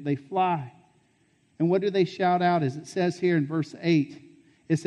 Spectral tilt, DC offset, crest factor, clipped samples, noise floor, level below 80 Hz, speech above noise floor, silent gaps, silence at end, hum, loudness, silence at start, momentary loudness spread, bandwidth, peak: -7 dB/octave; under 0.1%; 14 dB; under 0.1%; -66 dBFS; -72 dBFS; 41 dB; none; 0 s; none; -26 LUFS; 0 s; 7 LU; 10.5 kHz; -12 dBFS